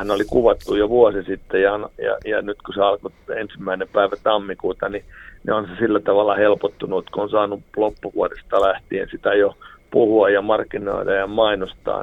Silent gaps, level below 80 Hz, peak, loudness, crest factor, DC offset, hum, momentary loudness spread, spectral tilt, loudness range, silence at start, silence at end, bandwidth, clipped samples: none; -44 dBFS; -2 dBFS; -20 LUFS; 18 dB; under 0.1%; none; 10 LU; -6.5 dB/octave; 3 LU; 0 s; 0 s; 11.5 kHz; under 0.1%